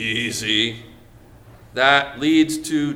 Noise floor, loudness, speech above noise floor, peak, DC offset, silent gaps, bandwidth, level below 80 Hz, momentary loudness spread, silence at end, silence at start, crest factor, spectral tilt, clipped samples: -46 dBFS; -18 LUFS; 27 dB; 0 dBFS; under 0.1%; none; 15.5 kHz; -52 dBFS; 9 LU; 0 s; 0 s; 20 dB; -3.5 dB/octave; under 0.1%